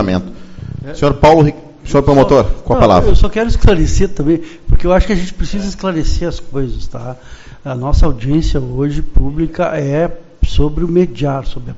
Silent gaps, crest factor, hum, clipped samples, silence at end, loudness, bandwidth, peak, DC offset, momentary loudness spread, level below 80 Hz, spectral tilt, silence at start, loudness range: none; 12 dB; none; 0.2%; 0 s; -14 LUFS; 7.8 kHz; 0 dBFS; under 0.1%; 17 LU; -18 dBFS; -7 dB/octave; 0 s; 7 LU